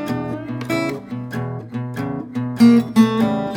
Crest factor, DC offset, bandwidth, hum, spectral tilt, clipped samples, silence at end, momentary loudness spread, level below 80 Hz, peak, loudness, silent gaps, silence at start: 16 dB; under 0.1%; 16 kHz; none; -7 dB/octave; under 0.1%; 0 s; 15 LU; -54 dBFS; -2 dBFS; -19 LUFS; none; 0 s